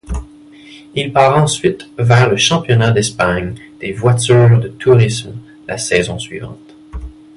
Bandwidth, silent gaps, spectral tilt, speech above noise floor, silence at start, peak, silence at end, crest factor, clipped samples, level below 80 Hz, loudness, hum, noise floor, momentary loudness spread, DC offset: 11.5 kHz; none; -5 dB/octave; 26 dB; 0.1 s; 0 dBFS; 0.25 s; 14 dB; under 0.1%; -34 dBFS; -13 LUFS; none; -39 dBFS; 20 LU; under 0.1%